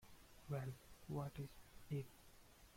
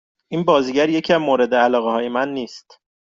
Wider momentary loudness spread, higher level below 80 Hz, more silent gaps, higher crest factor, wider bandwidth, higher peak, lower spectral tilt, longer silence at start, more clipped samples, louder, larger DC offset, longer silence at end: first, 18 LU vs 11 LU; second, -68 dBFS vs -62 dBFS; neither; about the same, 18 dB vs 16 dB; first, 16.5 kHz vs 7.6 kHz; second, -34 dBFS vs -4 dBFS; first, -7 dB/octave vs -5.5 dB/octave; second, 0 s vs 0.3 s; neither; second, -51 LUFS vs -18 LUFS; neither; second, 0 s vs 0.5 s